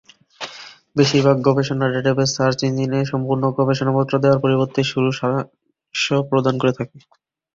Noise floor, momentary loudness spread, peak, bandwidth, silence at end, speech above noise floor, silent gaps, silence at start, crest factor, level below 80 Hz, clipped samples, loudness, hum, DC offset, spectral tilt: -40 dBFS; 14 LU; -2 dBFS; 7.6 kHz; 0.55 s; 22 dB; none; 0.4 s; 18 dB; -54 dBFS; under 0.1%; -19 LUFS; none; under 0.1%; -6 dB/octave